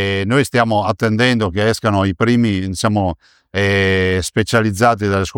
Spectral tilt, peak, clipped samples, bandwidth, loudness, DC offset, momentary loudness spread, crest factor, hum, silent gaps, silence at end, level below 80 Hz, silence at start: -5.5 dB/octave; -2 dBFS; under 0.1%; 17.5 kHz; -16 LUFS; under 0.1%; 4 LU; 14 dB; none; none; 0 s; -42 dBFS; 0 s